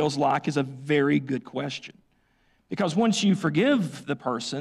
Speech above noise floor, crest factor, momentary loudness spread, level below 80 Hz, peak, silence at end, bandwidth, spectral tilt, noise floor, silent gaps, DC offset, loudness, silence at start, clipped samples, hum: 41 dB; 14 dB; 10 LU; -68 dBFS; -12 dBFS; 0 s; 12 kHz; -5.5 dB/octave; -66 dBFS; none; under 0.1%; -25 LUFS; 0 s; under 0.1%; none